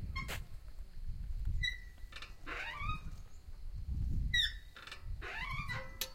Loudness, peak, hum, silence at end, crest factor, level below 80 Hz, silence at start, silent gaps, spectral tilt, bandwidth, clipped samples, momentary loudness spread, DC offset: -40 LUFS; -20 dBFS; none; 0 s; 20 dB; -44 dBFS; 0 s; none; -3 dB/octave; 16 kHz; under 0.1%; 19 LU; under 0.1%